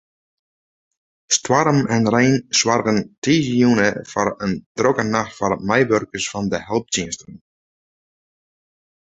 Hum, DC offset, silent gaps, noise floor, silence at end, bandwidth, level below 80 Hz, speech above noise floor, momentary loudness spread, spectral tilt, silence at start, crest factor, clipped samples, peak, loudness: none; under 0.1%; 3.18-3.22 s, 4.66-4.75 s; under -90 dBFS; 1.8 s; 8.4 kHz; -52 dBFS; over 71 dB; 8 LU; -4 dB/octave; 1.3 s; 18 dB; under 0.1%; -2 dBFS; -19 LUFS